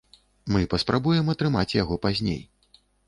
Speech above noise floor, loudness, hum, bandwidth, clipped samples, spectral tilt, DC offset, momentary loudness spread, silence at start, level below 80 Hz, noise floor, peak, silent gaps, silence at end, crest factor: 37 dB; -25 LUFS; none; 11.5 kHz; under 0.1%; -6.5 dB/octave; under 0.1%; 7 LU; 0.45 s; -44 dBFS; -61 dBFS; -8 dBFS; none; 0.65 s; 18 dB